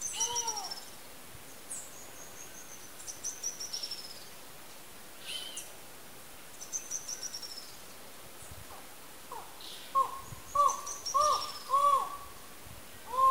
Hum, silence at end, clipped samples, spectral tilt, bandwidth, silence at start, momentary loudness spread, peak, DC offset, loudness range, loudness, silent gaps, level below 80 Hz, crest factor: none; 0 s; under 0.1%; -0.5 dB/octave; 16 kHz; 0 s; 20 LU; -16 dBFS; 0.3%; 11 LU; -34 LUFS; none; -66 dBFS; 20 dB